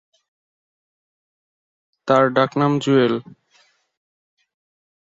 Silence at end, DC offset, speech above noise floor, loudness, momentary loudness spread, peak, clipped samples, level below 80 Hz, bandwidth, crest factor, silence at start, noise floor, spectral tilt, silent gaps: 1.8 s; under 0.1%; 42 dB; -18 LUFS; 9 LU; -2 dBFS; under 0.1%; -66 dBFS; 7.8 kHz; 20 dB; 2.05 s; -60 dBFS; -6.5 dB/octave; none